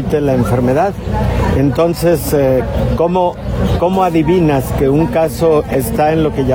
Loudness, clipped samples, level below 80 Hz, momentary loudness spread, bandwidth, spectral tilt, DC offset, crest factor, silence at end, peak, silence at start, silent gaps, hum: -13 LUFS; under 0.1%; -26 dBFS; 4 LU; 18.5 kHz; -7 dB/octave; under 0.1%; 10 dB; 0 s; -2 dBFS; 0 s; none; none